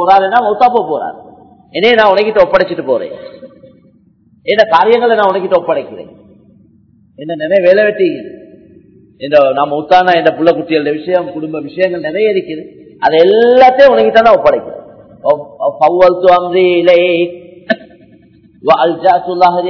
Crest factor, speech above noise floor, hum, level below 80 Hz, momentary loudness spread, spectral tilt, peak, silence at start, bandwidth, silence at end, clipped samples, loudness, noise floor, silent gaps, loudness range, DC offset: 12 dB; 39 dB; none; -50 dBFS; 16 LU; -6.5 dB/octave; 0 dBFS; 0 s; 5.4 kHz; 0 s; 2%; -10 LUFS; -48 dBFS; none; 5 LU; under 0.1%